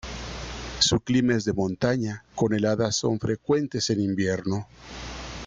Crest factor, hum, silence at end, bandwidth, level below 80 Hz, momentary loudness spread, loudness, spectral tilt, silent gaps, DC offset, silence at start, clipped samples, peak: 18 dB; none; 0 s; 9.6 kHz; -46 dBFS; 13 LU; -25 LUFS; -4.5 dB/octave; none; under 0.1%; 0.05 s; under 0.1%; -8 dBFS